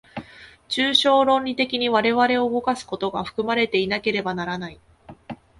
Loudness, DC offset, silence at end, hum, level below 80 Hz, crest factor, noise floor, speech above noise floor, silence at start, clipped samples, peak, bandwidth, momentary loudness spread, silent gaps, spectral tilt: -21 LUFS; under 0.1%; 0.25 s; none; -56 dBFS; 20 dB; -46 dBFS; 24 dB; 0.15 s; under 0.1%; -4 dBFS; 11.5 kHz; 17 LU; none; -4.5 dB/octave